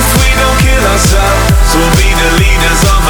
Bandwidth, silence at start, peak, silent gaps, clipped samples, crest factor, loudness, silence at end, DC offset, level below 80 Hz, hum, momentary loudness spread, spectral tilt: over 20 kHz; 0 s; 0 dBFS; none; under 0.1%; 8 dB; -8 LUFS; 0 s; under 0.1%; -10 dBFS; none; 1 LU; -4 dB/octave